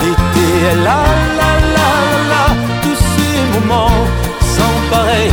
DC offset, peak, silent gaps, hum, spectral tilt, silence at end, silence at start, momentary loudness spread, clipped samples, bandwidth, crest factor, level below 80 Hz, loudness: under 0.1%; 0 dBFS; none; none; -5 dB/octave; 0 s; 0 s; 3 LU; under 0.1%; over 20 kHz; 12 dB; -20 dBFS; -12 LUFS